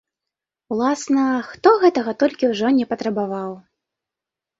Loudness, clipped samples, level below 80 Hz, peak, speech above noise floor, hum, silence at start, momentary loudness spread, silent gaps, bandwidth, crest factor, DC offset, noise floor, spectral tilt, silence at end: -19 LUFS; under 0.1%; -64 dBFS; -2 dBFS; 68 dB; none; 0.7 s; 12 LU; none; 7.8 kHz; 18 dB; under 0.1%; -87 dBFS; -5 dB/octave; 1 s